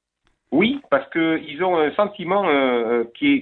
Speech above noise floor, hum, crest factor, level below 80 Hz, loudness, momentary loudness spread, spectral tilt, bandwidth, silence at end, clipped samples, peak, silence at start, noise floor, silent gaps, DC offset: 48 dB; none; 16 dB; -60 dBFS; -20 LUFS; 4 LU; -9 dB/octave; 4.3 kHz; 0 s; under 0.1%; -4 dBFS; 0.5 s; -68 dBFS; none; under 0.1%